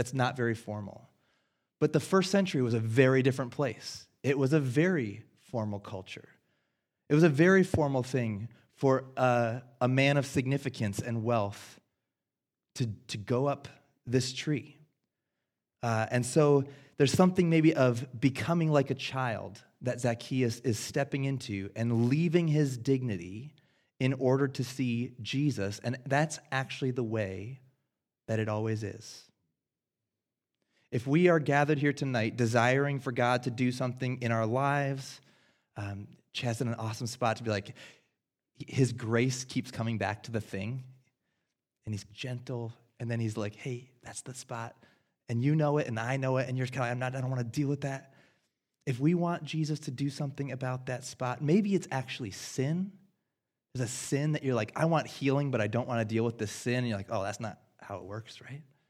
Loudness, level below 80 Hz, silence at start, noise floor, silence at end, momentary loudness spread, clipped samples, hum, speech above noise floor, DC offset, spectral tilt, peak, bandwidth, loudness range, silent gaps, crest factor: -31 LUFS; -68 dBFS; 0 s; under -90 dBFS; 0.25 s; 16 LU; under 0.1%; none; over 60 dB; under 0.1%; -6 dB/octave; -8 dBFS; 14.5 kHz; 8 LU; none; 24 dB